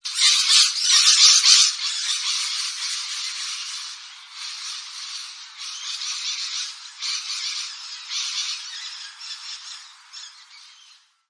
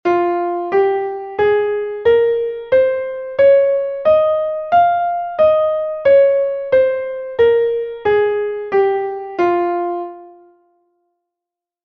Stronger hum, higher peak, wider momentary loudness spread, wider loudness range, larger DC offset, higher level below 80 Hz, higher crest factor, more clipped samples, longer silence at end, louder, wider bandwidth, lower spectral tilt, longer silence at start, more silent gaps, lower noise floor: neither; first, 0 dBFS vs -4 dBFS; first, 22 LU vs 9 LU; first, 14 LU vs 5 LU; neither; second, -86 dBFS vs -54 dBFS; first, 24 dB vs 12 dB; neither; second, 0.6 s vs 1.55 s; about the same, -18 LUFS vs -16 LUFS; first, 10.5 kHz vs 5.2 kHz; second, 8 dB/octave vs -7 dB/octave; about the same, 0.05 s vs 0.05 s; neither; second, -53 dBFS vs -85 dBFS